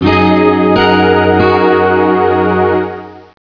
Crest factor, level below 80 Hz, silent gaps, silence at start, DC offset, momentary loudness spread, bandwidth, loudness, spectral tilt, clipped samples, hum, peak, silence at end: 10 dB; -40 dBFS; none; 0 s; under 0.1%; 5 LU; 5.4 kHz; -10 LUFS; -8.5 dB/octave; under 0.1%; none; 0 dBFS; 0.2 s